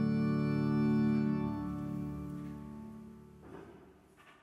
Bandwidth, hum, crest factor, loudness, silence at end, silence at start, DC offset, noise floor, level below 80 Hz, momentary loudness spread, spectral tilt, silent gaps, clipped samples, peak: 7 kHz; none; 14 dB; -34 LUFS; 0.1 s; 0 s; under 0.1%; -61 dBFS; -58 dBFS; 22 LU; -9 dB/octave; none; under 0.1%; -20 dBFS